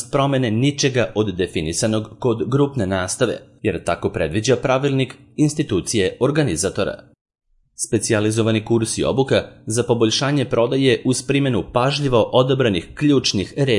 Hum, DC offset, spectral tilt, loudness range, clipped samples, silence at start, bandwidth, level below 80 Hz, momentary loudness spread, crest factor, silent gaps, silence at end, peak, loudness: none; under 0.1%; -5 dB/octave; 3 LU; under 0.1%; 0 s; 11.5 kHz; -48 dBFS; 6 LU; 18 dB; 7.21-7.25 s; 0 s; -2 dBFS; -19 LUFS